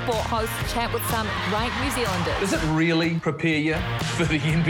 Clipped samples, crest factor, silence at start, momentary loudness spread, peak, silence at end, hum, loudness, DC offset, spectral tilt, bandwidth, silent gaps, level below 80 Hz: under 0.1%; 14 dB; 0 s; 4 LU; -10 dBFS; 0 s; none; -24 LUFS; under 0.1%; -5 dB/octave; 18 kHz; none; -38 dBFS